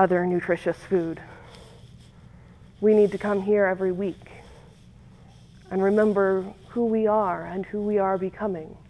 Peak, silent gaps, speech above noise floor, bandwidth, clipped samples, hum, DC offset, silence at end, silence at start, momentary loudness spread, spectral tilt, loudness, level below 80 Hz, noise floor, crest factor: -6 dBFS; none; 26 dB; 11 kHz; under 0.1%; none; under 0.1%; 0.1 s; 0 s; 11 LU; -8.5 dB/octave; -24 LUFS; -54 dBFS; -50 dBFS; 18 dB